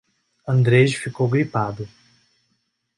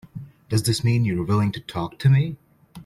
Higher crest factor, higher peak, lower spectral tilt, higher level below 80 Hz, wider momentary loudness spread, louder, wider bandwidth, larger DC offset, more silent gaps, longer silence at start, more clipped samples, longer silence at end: about the same, 18 dB vs 14 dB; first, -4 dBFS vs -8 dBFS; about the same, -7 dB/octave vs -6 dB/octave; about the same, -56 dBFS vs -52 dBFS; about the same, 19 LU vs 18 LU; about the same, -20 LUFS vs -22 LUFS; second, 11.5 kHz vs 15.5 kHz; neither; neither; first, 0.45 s vs 0.15 s; neither; first, 1.1 s vs 0.05 s